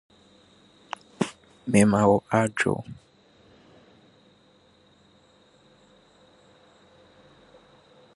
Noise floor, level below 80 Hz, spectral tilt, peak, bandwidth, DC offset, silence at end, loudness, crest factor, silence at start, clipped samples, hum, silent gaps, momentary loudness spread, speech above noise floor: -59 dBFS; -60 dBFS; -6 dB/octave; -6 dBFS; 11.5 kHz; under 0.1%; 5.2 s; -24 LUFS; 24 dB; 1.2 s; under 0.1%; none; none; 21 LU; 37 dB